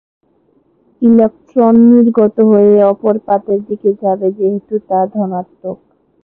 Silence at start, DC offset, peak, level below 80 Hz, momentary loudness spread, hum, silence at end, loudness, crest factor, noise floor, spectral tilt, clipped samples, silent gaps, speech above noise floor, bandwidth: 1 s; under 0.1%; 0 dBFS; -56 dBFS; 12 LU; none; 0.5 s; -12 LUFS; 12 dB; -55 dBFS; -12.5 dB/octave; under 0.1%; none; 44 dB; 2.7 kHz